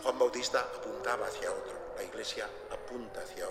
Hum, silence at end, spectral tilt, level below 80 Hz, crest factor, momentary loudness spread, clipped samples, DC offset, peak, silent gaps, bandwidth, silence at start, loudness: none; 0 s; -2 dB/octave; -60 dBFS; 20 dB; 12 LU; under 0.1%; under 0.1%; -16 dBFS; none; 15.5 kHz; 0 s; -36 LUFS